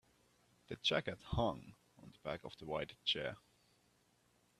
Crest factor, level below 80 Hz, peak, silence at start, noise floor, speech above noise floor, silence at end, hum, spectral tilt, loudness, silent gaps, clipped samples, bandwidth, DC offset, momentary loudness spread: 24 dB; -60 dBFS; -20 dBFS; 0.7 s; -75 dBFS; 34 dB; 1.2 s; 60 Hz at -70 dBFS; -5 dB/octave; -40 LUFS; none; under 0.1%; 13.5 kHz; under 0.1%; 15 LU